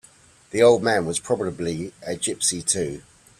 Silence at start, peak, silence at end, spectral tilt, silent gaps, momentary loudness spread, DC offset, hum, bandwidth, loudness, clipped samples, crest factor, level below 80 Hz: 0.55 s; -4 dBFS; 0.4 s; -3.5 dB/octave; none; 14 LU; under 0.1%; none; 14 kHz; -22 LUFS; under 0.1%; 18 dB; -56 dBFS